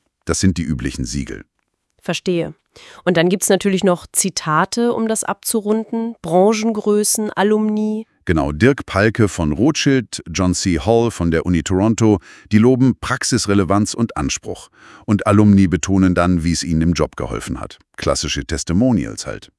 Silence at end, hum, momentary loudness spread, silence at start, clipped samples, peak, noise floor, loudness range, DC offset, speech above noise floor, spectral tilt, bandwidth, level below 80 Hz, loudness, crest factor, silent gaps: 0.15 s; none; 10 LU; 0.25 s; under 0.1%; 0 dBFS; -66 dBFS; 3 LU; under 0.1%; 49 dB; -5 dB/octave; 12 kHz; -38 dBFS; -17 LUFS; 16 dB; none